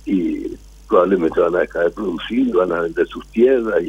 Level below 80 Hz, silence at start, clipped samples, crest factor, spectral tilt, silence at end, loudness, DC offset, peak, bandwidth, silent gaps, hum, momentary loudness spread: -44 dBFS; 0.05 s; under 0.1%; 16 dB; -7 dB/octave; 0 s; -18 LUFS; under 0.1%; -2 dBFS; 11.5 kHz; none; none; 9 LU